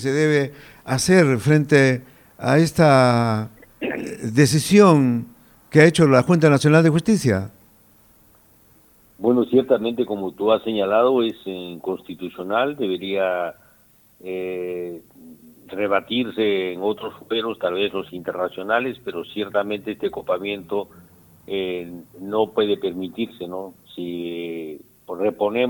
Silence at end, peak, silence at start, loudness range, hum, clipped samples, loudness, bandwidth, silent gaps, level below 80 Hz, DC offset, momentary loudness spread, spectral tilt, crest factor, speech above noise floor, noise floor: 0 s; 0 dBFS; 0 s; 10 LU; none; under 0.1%; -20 LUFS; 19 kHz; none; -58 dBFS; under 0.1%; 17 LU; -6 dB/octave; 20 dB; 35 dB; -55 dBFS